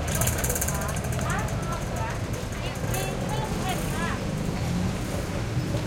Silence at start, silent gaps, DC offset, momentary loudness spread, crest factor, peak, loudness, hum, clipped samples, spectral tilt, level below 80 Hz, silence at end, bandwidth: 0 s; none; under 0.1%; 5 LU; 18 dB; -8 dBFS; -28 LUFS; none; under 0.1%; -4.5 dB/octave; -36 dBFS; 0 s; 17 kHz